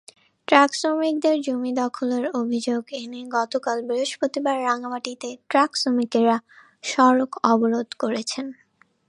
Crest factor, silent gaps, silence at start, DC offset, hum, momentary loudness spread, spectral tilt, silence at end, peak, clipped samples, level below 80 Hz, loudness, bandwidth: 22 dB; none; 0.5 s; under 0.1%; none; 12 LU; -3.5 dB/octave; 0.55 s; 0 dBFS; under 0.1%; -76 dBFS; -22 LUFS; 11 kHz